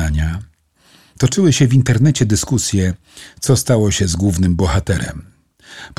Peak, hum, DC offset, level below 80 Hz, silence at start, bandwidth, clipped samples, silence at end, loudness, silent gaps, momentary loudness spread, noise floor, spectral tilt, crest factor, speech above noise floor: -2 dBFS; none; 0.3%; -30 dBFS; 0 s; 14.5 kHz; under 0.1%; 0.1 s; -15 LUFS; none; 12 LU; -52 dBFS; -5.5 dB/octave; 14 dB; 37 dB